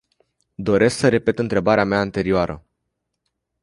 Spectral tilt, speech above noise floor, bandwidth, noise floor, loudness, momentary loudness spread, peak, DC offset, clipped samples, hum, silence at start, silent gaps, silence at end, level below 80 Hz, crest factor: -6 dB/octave; 59 dB; 11.5 kHz; -77 dBFS; -19 LUFS; 9 LU; -2 dBFS; under 0.1%; under 0.1%; none; 0.6 s; none; 1.05 s; -46 dBFS; 18 dB